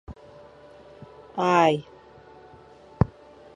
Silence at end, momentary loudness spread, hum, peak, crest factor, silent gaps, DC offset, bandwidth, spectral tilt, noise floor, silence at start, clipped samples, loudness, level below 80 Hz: 0.5 s; 27 LU; none; -2 dBFS; 26 dB; none; under 0.1%; 11.5 kHz; -6.5 dB/octave; -50 dBFS; 0.1 s; under 0.1%; -24 LUFS; -46 dBFS